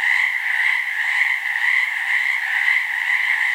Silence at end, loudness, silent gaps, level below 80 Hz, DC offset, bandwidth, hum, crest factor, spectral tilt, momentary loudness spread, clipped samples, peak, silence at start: 0 s; -18 LUFS; none; -82 dBFS; under 0.1%; 16 kHz; none; 14 dB; 4 dB/octave; 2 LU; under 0.1%; -6 dBFS; 0 s